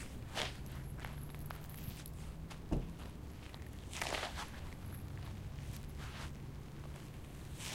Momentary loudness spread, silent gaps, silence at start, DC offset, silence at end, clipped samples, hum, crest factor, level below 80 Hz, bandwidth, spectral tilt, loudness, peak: 9 LU; none; 0 s; under 0.1%; 0 s; under 0.1%; none; 24 dB; -50 dBFS; 16.5 kHz; -4.5 dB/octave; -46 LUFS; -20 dBFS